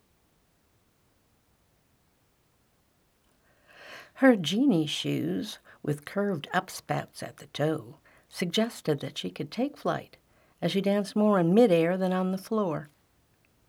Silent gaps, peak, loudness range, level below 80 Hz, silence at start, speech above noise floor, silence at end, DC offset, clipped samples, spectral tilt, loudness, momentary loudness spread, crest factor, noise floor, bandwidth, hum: none; -8 dBFS; 6 LU; -72 dBFS; 3.8 s; 41 dB; 0.85 s; under 0.1%; under 0.1%; -6 dB/octave; -28 LUFS; 15 LU; 22 dB; -68 dBFS; 17 kHz; none